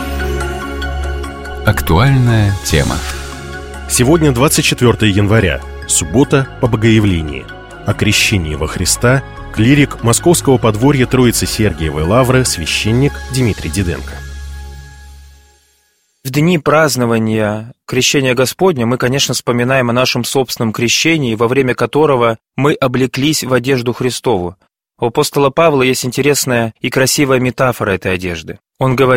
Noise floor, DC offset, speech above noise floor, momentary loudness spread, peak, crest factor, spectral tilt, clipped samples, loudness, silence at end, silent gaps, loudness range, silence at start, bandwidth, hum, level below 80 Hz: -58 dBFS; under 0.1%; 46 dB; 11 LU; 0 dBFS; 14 dB; -4.5 dB/octave; under 0.1%; -13 LUFS; 0 s; none; 4 LU; 0 s; 16.5 kHz; none; -28 dBFS